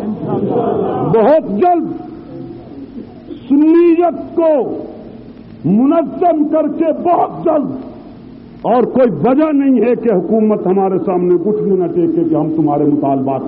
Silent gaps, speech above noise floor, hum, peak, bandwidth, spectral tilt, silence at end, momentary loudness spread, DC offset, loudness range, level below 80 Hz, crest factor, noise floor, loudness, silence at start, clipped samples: none; 22 dB; none; -2 dBFS; 4.7 kHz; -8.5 dB/octave; 0 s; 19 LU; under 0.1%; 2 LU; -50 dBFS; 10 dB; -34 dBFS; -13 LUFS; 0 s; under 0.1%